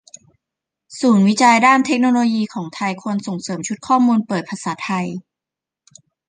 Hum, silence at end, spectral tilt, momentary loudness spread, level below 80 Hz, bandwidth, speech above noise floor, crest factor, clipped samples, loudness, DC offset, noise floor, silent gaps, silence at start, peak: none; 1.1 s; -5 dB/octave; 13 LU; -66 dBFS; 9.8 kHz; 70 dB; 18 dB; under 0.1%; -17 LUFS; under 0.1%; -86 dBFS; none; 0.9 s; -2 dBFS